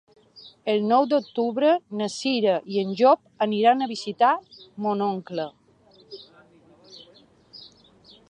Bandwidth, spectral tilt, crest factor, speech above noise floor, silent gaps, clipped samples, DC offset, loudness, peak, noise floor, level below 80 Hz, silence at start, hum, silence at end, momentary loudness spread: 10.5 kHz; -5.5 dB/octave; 18 dB; 34 dB; none; under 0.1%; under 0.1%; -23 LUFS; -6 dBFS; -56 dBFS; -74 dBFS; 0.35 s; none; 0.65 s; 24 LU